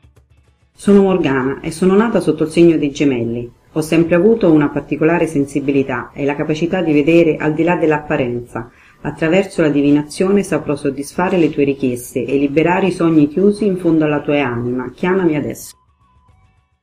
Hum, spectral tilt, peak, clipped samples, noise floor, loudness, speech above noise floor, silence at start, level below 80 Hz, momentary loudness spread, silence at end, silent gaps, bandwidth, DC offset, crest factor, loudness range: none; -7 dB/octave; 0 dBFS; under 0.1%; -54 dBFS; -15 LUFS; 39 dB; 0.8 s; -46 dBFS; 9 LU; 1.1 s; none; 15 kHz; under 0.1%; 14 dB; 2 LU